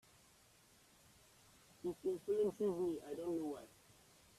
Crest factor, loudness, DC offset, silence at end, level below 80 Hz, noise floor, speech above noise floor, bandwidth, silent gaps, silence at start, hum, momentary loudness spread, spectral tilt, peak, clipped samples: 16 dB; -42 LUFS; under 0.1%; 0.7 s; -76 dBFS; -69 dBFS; 28 dB; 14.5 kHz; none; 1.85 s; none; 10 LU; -6.5 dB/octave; -28 dBFS; under 0.1%